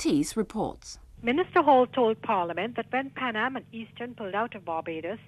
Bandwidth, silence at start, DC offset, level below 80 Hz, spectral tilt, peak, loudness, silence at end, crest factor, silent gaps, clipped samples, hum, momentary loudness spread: 13.5 kHz; 0 s; under 0.1%; -58 dBFS; -4.5 dB/octave; -10 dBFS; -27 LUFS; 0.05 s; 18 dB; none; under 0.1%; none; 17 LU